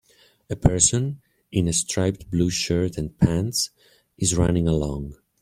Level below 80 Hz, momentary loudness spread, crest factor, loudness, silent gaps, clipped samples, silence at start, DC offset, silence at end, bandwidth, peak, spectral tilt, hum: -40 dBFS; 11 LU; 22 dB; -22 LUFS; none; under 0.1%; 0.5 s; under 0.1%; 0.3 s; 15.5 kHz; -2 dBFS; -4.5 dB/octave; none